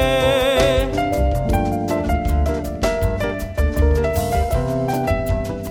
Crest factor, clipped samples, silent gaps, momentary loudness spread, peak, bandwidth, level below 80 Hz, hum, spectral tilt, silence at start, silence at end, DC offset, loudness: 14 dB; under 0.1%; none; 6 LU; -4 dBFS; over 20 kHz; -24 dBFS; none; -6 dB/octave; 0 s; 0 s; under 0.1%; -19 LUFS